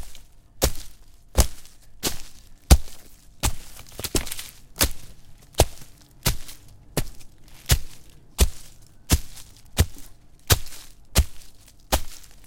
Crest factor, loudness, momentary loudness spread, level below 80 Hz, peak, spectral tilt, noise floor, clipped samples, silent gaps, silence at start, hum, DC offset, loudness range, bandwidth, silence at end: 26 dB; -25 LUFS; 21 LU; -30 dBFS; 0 dBFS; -3.5 dB/octave; -44 dBFS; under 0.1%; none; 0 s; none; under 0.1%; 2 LU; 17 kHz; 0 s